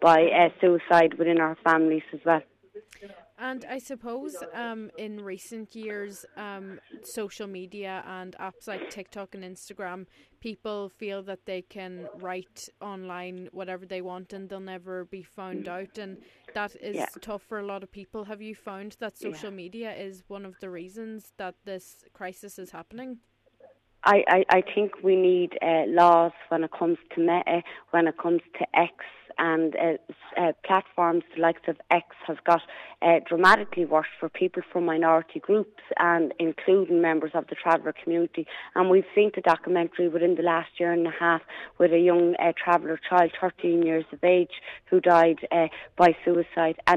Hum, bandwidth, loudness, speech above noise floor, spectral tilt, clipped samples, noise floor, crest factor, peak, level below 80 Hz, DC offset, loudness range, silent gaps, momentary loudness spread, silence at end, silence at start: none; 13.5 kHz; -24 LUFS; 32 dB; -6 dB/octave; under 0.1%; -58 dBFS; 20 dB; -6 dBFS; -68 dBFS; under 0.1%; 16 LU; none; 20 LU; 0 s; 0 s